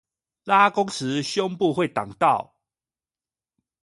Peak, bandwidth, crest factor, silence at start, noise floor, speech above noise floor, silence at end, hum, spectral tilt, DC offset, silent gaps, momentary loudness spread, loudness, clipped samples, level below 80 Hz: -4 dBFS; 11.5 kHz; 20 dB; 0.45 s; under -90 dBFS; over 68 dB; 1.4 s; none; -4.5 dB/octave; under 0.1%; none; 9 LU; -22 LUFS; under 0.1%; -66 dBFS